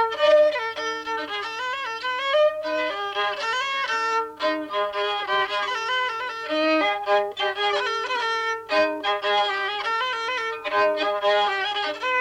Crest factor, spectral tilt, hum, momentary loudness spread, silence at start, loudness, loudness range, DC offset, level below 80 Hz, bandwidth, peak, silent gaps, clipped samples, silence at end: 16 dB; -1.5 dB/octave; none; 6 LU; 0 s; -23 LUFS; 2 LU; under 0.1%; -68 dBFS; 11 kHz; -8 dBFS; none; under 0.1%; 0 s